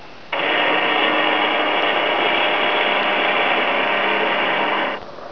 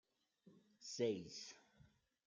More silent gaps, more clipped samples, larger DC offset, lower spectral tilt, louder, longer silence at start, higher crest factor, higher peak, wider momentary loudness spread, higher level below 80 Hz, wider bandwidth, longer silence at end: neither; neither; first, 1% vs under 0.1%; about the same, -4.5 dB/octave vs -4 dB/octave; first, -17 LUFS vs -46 LUFS; second, 0 s vs 0.45 s; second, 14 dB vs 22 dB; first, -4 dBFS vs -28 dBFS; second, 4 LU vs 16 LU; first, -62 dBFS vs -86 dBFS; second, 5.4 kHz vs 9.4 kHz; second, 0 s vs 0.4 s